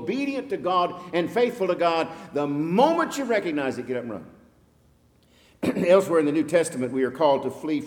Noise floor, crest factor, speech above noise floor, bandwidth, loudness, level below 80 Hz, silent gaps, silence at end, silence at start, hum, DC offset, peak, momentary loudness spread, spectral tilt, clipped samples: -60 dBFS; 18 dB; 36 dB; 18 kHz; -24 LUFS; -64 dBFS; none; 0 s; 0 s; none; under 0.1%; -6 dBFS; 10 LU; -5.5 dB/octave; under 0.1%